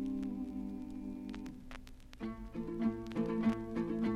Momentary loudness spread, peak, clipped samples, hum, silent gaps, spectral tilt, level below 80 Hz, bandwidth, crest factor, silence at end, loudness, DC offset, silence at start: 15 LU; -22 dBFS; under 0.1%; none; none; -8 dB/octave; -54 dBFS; 9.8 kHz; 18 dB; 0 s; -40 LUFS; under 0.1%; 0 s